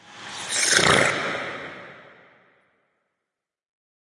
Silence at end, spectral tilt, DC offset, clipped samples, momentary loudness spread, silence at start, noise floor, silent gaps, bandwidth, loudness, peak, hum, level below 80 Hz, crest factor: 2.05 s; -1.5 dB/octave; under 0.1%; under 0.1%; 21 LU; 0.1 s; -84 dBFS; none; 11.5 kHz; -20 LUFS; -2 dBFS; none; -62 dBFS; 24 dB